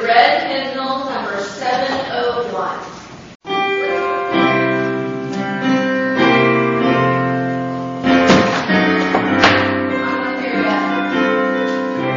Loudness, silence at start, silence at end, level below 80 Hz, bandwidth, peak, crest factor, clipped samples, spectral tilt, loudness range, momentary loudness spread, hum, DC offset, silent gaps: -16 LUFS; 0 s; 0 s; -52 dBFS; 7.4 kHz; 0 dBFS; 16 dB; under 0.1%; -3.5 dB/octave; 6 LU; 10 LU; none; under 0.1%; 3.35-3.40 s